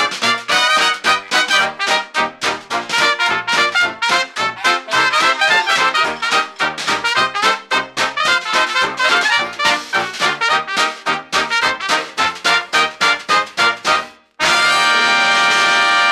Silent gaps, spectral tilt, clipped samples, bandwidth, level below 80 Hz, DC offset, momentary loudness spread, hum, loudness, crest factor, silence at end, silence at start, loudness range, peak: none; -0.5 dB/octave; under 0.1%; 16 kHz; -56 dBFS; under 0.1%; 7 LU; none; -14 LUFS; 14 dB; 0 s; 0 s; 2 LU; -2 dBFS